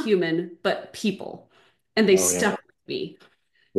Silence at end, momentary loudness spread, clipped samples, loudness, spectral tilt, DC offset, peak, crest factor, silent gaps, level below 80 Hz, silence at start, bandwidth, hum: 0 s; 18 LU; under 0.1%; -24 LUFS; -3.5 dB/octave; under 0.1%; -6 dBFS; 18 dB; none; -68 dBFS; 0 s; 12.5 kHz; none